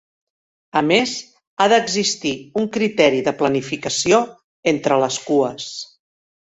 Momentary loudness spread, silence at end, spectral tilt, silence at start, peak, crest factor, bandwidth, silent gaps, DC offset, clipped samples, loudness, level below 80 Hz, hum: 14 LU; 0.65 s; -3.5 dB/octave; 0.75 s; 0 dBFS; 20 dB; 8.4 kHz; 1.47-1.57 s, 4.44-4.63 s; under 0.1%; under 0.1%; -18 LUFS; -60 dBFS; none